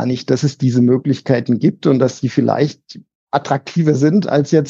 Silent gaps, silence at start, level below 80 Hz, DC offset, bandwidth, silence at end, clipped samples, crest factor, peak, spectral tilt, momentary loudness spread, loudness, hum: 3.15-3.27 s; 0 s; -62 dBFS; under 0.1%; 7.6 kHz; 0 s; under 0.1%; 14 dB; 0 dBFS; -7.5 dB/octave; 5 LU; -16 LUFS; none